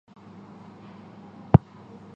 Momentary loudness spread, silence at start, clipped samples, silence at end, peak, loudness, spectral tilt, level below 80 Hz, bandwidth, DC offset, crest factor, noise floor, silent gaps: 26 LU; 1.55 s; under 0.1%; 0.6 s; 0 dBFS; -21 LUFS; -11 dB/octave; -42 dBFS; 5.4 kHz; under 0.1%; 26 dB; -47 dBFS; none